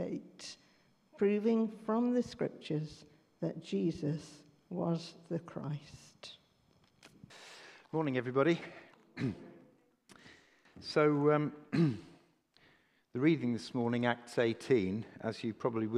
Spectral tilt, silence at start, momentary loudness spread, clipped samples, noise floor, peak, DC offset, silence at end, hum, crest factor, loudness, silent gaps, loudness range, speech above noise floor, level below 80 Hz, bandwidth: -7 dB/octave; 0 s; 21 LU; under 0.1%; -70 dBFS; -14 dBFS; under 0.1%; 0 s; none; 22 dB; -35 LUFS; none; 8 LU; 36 dB; -74 dBFS; 11.5 kHz